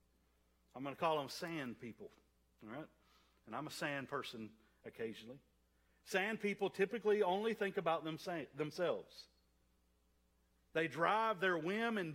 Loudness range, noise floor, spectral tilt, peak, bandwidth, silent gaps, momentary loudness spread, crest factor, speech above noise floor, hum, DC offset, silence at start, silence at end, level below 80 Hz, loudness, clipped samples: 9 LU; -77 dBFS; -5 dB/octave; -20 dBFS; 16 kHz; none; 20 LU; 22 dB; 36 dB; none; under 0.1%; 0.75 s; 0 s; -78 dBFS; -40 LUFS; under 0.1%